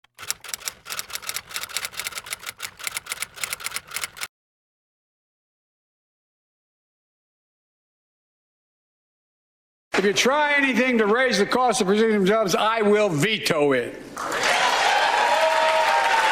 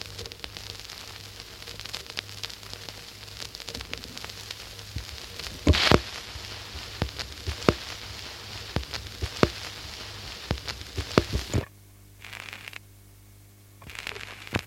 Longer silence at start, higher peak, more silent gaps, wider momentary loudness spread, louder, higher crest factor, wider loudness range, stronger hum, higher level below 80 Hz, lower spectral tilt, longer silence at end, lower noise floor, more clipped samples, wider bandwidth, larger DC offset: first, 0.2 s vs 0 s; about the same, -2 dBFS vs 0 dBFS; first, 4.29-9.91 s vs none; about the same, 12 LU vs 14 LU; first, -21 LUFS vs -31 LUFS; second, 20 dB vs 32 dB; first, 13 LU vs 10 LU; second, none vs 50 Hz at -55 dBFS; second, -62 dBFS vs -42 dBFS; second, -3 dB/octave vs -4.5 dB/octave; about the same, 0 s vs 0 s; first, under -90 dBFS vs -52 dBFS; neither; first, 19 kHz vs 16.5 kHz; neither